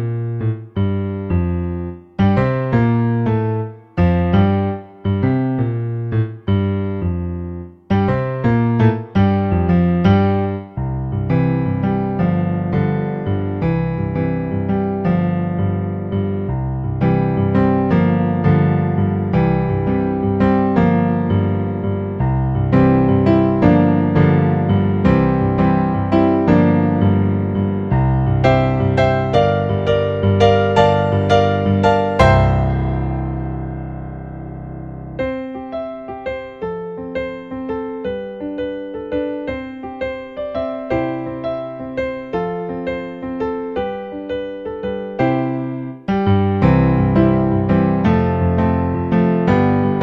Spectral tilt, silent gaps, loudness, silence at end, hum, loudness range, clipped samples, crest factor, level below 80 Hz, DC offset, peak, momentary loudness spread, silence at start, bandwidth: -9.5 dB/octave; none; -17 LUFS; 0 s; none; 10 LU; under 0.1%; 16 dB; -34 dBFS; under 0.1%; 0 dBFS; 12 LU; 0 s; 7.2 kHz